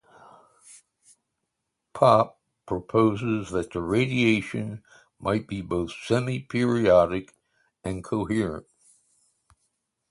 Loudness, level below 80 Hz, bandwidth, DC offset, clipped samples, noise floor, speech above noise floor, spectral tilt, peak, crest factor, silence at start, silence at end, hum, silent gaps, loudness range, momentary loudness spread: -25 LUFS; -52 dBFS; 11.5 kHz; under 0.1%; under 0.1%; -81 dBFS; 57 dB; -6.5 dB/octave; -6 dBFS; 22 dB; 0.7 s; 1.5 s; none; none; 3 LU; 15 LU